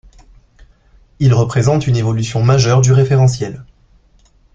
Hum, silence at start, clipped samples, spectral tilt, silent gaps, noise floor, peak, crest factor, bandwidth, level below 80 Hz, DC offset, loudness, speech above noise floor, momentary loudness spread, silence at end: none; 1.2 s; under 0.1%; -6.5 dB/octave; none; -51 dBFS; -2 dBFS; 14 dB; 7.8 kHz; -40 dBFS; under 0.1%; -13 LUFS; 39 dB; 9 LU; 0.9 s